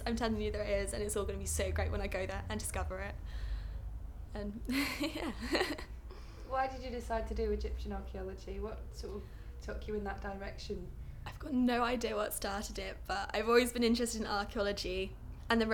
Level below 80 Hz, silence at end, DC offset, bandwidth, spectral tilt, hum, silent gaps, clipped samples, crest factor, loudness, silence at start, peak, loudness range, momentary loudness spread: -44 dBFS; 0 s; under 0.1%; 19 kHz; -4.5 dB/octave; none; none; under 0.1%; 22 dB; -37 LUFS; 0 s; -14 dBFS; 8 LU; 14 LU